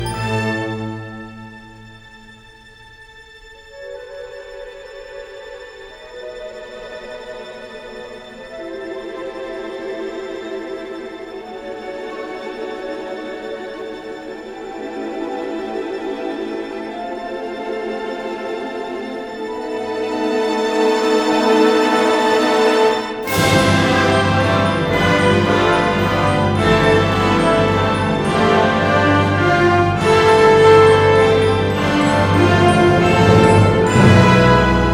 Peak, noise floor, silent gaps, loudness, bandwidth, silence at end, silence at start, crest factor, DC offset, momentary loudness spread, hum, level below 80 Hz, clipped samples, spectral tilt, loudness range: 0 dBFS; -43 dBFS; none; -15 LUFS; over 20 kHz; 0 s; 0 s; 16 dB; under 0.1%; 21 LU; none; -38 dBFS; under 0.1%; -6 dB/octave; 21 LU